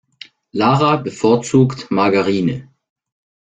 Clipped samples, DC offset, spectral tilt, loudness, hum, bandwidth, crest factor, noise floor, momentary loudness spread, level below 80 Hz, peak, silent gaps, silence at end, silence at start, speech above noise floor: under 0.1%; under 0.1%; -6.5 dB/octave; -16 LUFS; none; 9.4 kHz; 16 dB; -43 dBFS; 7 LU; -54 dBFS; -2 dBFS; none; 0.85 s; 0.55 s; 28 dB